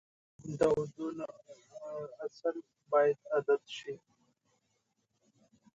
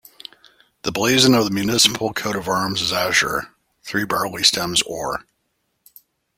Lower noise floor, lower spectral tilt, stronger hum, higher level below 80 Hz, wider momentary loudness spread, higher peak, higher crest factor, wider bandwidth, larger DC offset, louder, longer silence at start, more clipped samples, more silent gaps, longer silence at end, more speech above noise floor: first, -79 dBFS vs -71 dBFS; first, -6 dB/octave vs -2.5 dB/octave; neither; second, -70 dBFS vs -52 dBFS; about the same, 19 LU vs 17 LU; second, -16 dBFS vs 0 dBFS; about the same, 20 dB vs 20 dB; second, 9.8 kHz vs 16.5 kHz; neither; second, -34 LUFS vs -18 LUFS; second, 0.4 s vs 0.85 s; neither; neither; first, 1.8 s vs 1.15 s; second, 45 dB vs 52 dB